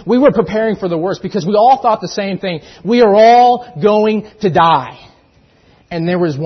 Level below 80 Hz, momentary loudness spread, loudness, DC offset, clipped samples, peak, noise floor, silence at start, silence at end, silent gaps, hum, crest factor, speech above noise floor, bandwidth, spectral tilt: -50 dBFS; 13 LU; -12 LUFS; under 0.1%; under 0.1%; 0 dBFS; -50 dBFS; 0 s; 0 s; none; none; 12 dB; 38 dB; 6.4 kHz; -6.5 dB/octave